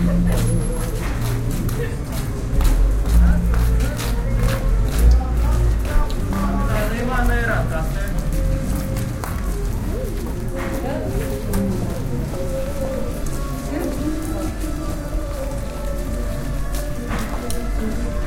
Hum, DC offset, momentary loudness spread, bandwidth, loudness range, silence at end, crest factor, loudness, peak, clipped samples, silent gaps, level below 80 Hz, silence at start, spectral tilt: none; under 0.1%; 8 LU; 16.5 kHz; 7 LU; 0 s; 18 dB; -23 LUFS; -2 dBFS; under 0.1%; none; -22 dBFS; 0 s; -6 dB/octave